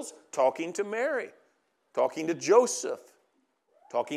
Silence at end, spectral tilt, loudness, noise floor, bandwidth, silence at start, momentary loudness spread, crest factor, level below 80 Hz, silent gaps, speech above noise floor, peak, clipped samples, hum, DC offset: 0 s; -3 dB/octave; -28 LUFS; -73 dBFS; 13.5 kHz; 0 s; 14 LU; 22 dB; under -90 dBFS; none; 45 dB; -8 dBFS; under 0.1%; none; under 0.1%